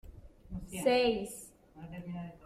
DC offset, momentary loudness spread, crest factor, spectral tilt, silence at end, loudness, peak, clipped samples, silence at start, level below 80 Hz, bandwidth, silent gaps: under 0.1%; 21 LU; 20 dB; -4.5 dB/octave; 0 s; -33 LUFS; -16 dBFS; under 0.1%; 0.05 s; -54 dBFS; 15 kHz; none